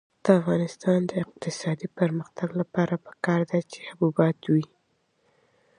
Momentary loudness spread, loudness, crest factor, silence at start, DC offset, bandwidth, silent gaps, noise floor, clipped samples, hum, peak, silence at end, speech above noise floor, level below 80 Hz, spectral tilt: 9 LU; -26 LUFS; 22 dB; 0.25 s; under 0.1%; 10.5 kHz; none; -70 dBFS; under 0.1%; none; -4 dBFS; 1.15 s; 45 dB; -68 dBFS; -7.5 dB/octave